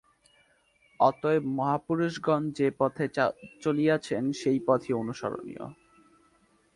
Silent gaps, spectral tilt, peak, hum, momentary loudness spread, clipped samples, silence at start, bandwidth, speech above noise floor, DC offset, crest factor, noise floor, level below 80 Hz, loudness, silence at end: none; -6.5 dB/octave; -8 dBFS; none; 10 LU; under 0.1%; 1 s; 11.5 kHz; 38 dB; under 0.1%; 20 dB; -66 dBFS; -68 dBFS; -28 LUFS; 1.05 s